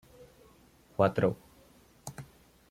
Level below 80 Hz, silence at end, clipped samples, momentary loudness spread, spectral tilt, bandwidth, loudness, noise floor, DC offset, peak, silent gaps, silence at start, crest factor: -62 dBFS; 0.45 s; under 0.1%; 22 LU; -7 dB/octave; 16 kHz; -30 LUFS; -61 dBFS; under 0.1%; -10 dBFS; none; 0.2 s; 24 dB